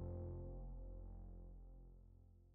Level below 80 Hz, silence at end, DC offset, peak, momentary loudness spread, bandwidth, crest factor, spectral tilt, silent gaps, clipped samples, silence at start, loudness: -56 dBFS; 0 s; under 0.1%; -38 dBFS; 16 LU; 1.7 kHz; 14 dB; -12 dB/octave; none; under 0.1%; 0 s; -56 LUFS